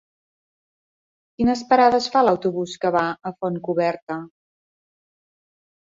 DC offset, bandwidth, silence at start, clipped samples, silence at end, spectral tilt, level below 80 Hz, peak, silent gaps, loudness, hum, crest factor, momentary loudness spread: under 0.1%; 7.8 kHz; 1.4 s; under 0.1%; 1.7 s; -5.5 dB/octave; -56 dBFS; -4 dBFS; 4.02-4.07 s; -21 LUFS; none; 20 dB; 12 LU